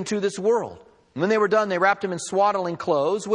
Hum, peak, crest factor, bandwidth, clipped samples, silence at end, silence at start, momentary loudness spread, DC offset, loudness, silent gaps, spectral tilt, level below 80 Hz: none; -6 dBFS; 16 dB; 10.5 kHz; under 0.1%; 0 s; 0 s; 7 LU; under 0.1%; -22 LUFS; none; -4.5 dB/octave; -68 dBFS